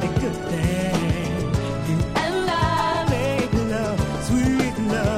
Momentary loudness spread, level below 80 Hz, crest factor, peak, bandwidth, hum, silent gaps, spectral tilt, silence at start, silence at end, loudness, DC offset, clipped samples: 4 LU; -36 dBFS; 16 dB; -6 dBFS; 15.5 kHz; none; none; -6 dB/octave; 0 s; 0 s; -22 LUFS; under 0.1%; under 0.1%